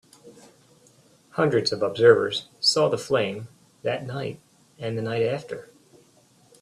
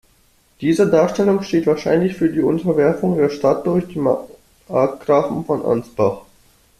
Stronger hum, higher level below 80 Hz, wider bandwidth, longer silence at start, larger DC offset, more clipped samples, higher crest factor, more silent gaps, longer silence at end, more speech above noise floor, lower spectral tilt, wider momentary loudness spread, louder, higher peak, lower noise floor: neither; second, -66 dBFS vs -52 dBFS; second, 12.5 kHz vs 14 kHz; second, 0.25 s vs 0.6 s; neither; neither; first, 22 dB vs 16 dB; neither; first, 1 s vs 0.6 s; second, 35 dB vs 39 dB; second, -4.5 dB/octave vs -7.5 dB/octave; first, 19 LU vs 6 LU; second, -24 LUFS vs -18 LUFS; about the same, -4 dBFS vs -2 dBFS; about the same, -58 dBFS vs -56 dBFS